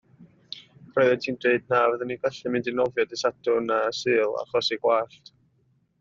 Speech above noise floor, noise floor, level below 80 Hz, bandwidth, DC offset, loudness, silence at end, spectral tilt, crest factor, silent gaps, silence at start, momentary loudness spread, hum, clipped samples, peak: 42 dB; -67 dBFS; -68 dBFS; 7.6 kHz; under 0.1%; -25 LUFS; 0.95 s; -2.5 dB/octave; 18 dB; none; 0.2 s; 9 LU; none; under 0.1%; -6 dBFS